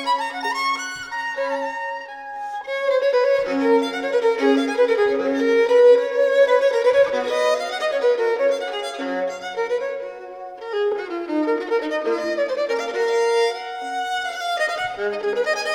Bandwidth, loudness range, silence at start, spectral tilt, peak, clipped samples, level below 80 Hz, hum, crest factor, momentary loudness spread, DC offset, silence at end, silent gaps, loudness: 12.5 kHz; 7 LU; 0 s; -2.5 dB/octave; -4 dBFS; under 0.1%; -64 dBFS; none; 16 dB; 11 LU; under 0.1%; 0 s; none; -21 LUFS